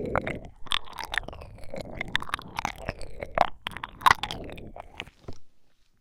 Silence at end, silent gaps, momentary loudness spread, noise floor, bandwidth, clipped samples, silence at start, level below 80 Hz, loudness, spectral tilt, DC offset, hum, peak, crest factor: 0.35 s; none; 19 LU; -58 dBFS; 17 kHz; under 0.1%; 0 s; -46 dBFS; -30 LUFS; -3.5 dB/octave; under 0.1%; none; -6 dBFS; 26 dB